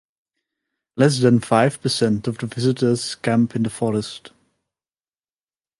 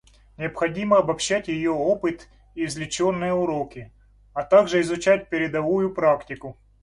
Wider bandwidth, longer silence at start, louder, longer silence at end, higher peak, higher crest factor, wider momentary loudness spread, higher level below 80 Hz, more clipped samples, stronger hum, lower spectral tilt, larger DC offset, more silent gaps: about the same, 11.5 kHz vs 11.5 kHz; first, 0.95 s vs 0.4 s; first, -20 LUFS vs -23 LUFS; first, 1.6 s vs 0.3 s; about the same, -2 dBFS vs -4 dBFS; about the same, 20 dB vs 20 dB; second, 10 LU vs 15 LU; about the same, -58 dBFS vs -54 dBFS; neither; neither; about the same, -6 dB/octave vs -5 dB/octave; neither; neither